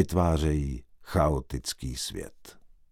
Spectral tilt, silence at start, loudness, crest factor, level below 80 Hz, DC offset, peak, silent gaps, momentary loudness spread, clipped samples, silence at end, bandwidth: -6 dB/octave; 0 s; -29 LUFS; 20 dB; -36 dBFS; under 0.1%; -10 dBFS; none; 15 LU; under 0.1%; 0.25 s; 16 kHz